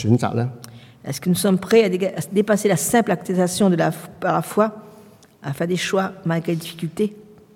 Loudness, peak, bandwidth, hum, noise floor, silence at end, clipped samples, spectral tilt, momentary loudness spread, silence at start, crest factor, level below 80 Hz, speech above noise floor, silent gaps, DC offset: -20 LUFS; -4 dBFS; 17 kHz; none; -47 dBFS; 0.35 s; under 0.1%; -5.5 dB/octave; 12 LU; 0 s; 18 dB; -60 dBFS; 27 dB; none; under 0.1%